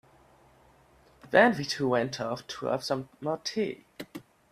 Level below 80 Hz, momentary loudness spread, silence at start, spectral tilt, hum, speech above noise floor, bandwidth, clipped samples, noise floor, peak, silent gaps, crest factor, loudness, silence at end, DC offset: -66 dBFS; 22 LU; 1.25 s; -4.5 dB/octave; none; 32 dB; 15.5 kHz; under 0.1%; -60 dBFS; -6 dBFS; none; 24 dB; -28 LUFS; 0.3 s; under 0.1%